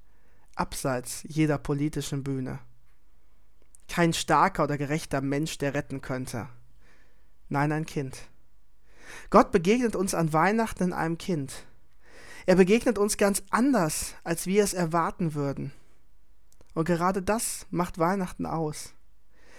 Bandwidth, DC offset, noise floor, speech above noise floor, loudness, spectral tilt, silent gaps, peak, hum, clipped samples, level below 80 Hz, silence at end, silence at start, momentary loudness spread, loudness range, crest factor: 18 kHz; 0.6%; -62 dBFS; 36 dB; -27 LUFS; -5 dB/octave; none; -6 dBFS; none; under 0.1%; -50 dBFS; 0.7 s; 0.55 s; 15 LU; 6 LU; 22 dB